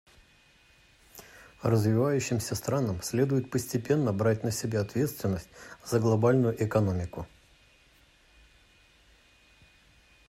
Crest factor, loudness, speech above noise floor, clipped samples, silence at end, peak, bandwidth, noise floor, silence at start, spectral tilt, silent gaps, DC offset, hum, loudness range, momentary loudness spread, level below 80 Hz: 18 dB; -28 LUFS; 34 dB; under 0.1%; 3 s; -12 dBFS; 16 kHz; -61 dBFS; 1.15 s; -6.5 dB/octave; none; under 0.1%; none; 5 LU; 17 LU; -58 dBFS